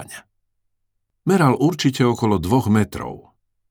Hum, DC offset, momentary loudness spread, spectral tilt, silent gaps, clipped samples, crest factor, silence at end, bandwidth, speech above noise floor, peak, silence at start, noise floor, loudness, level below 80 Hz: none; under 0.1%; 16 LU; -6.5 dB/octave; none; under 0.1%; 18 dB; 0.5 s; over 20 kHz; 55 dB; -2 dBFS; 0 s; -72 dBFS; -19 LUFS; -48 dBFS